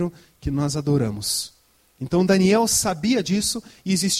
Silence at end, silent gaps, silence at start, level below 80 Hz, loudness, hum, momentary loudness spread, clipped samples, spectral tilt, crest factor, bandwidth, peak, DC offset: 0 s; none; 0 s; -44 dBFS; -21 LUFS; none; 12 LU; under 0.1%; -4.5 dB/octave; 14 dB; 15.5 kHz; -6 dBFS; under 0.1%